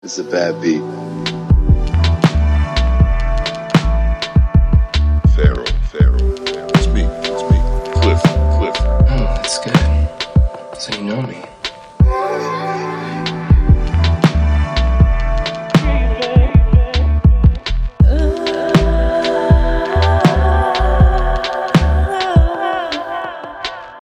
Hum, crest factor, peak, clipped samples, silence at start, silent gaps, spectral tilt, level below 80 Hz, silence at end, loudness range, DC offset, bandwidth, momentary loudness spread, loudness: none; 14 dB; 0 dBFS; under 0.1%; 0.05 s; none; -6.5 dB/octave; -16 dBFS; 0 s; 3 LU; under 0.1%; 10.5 kHz; 9 LU; -15 LUFS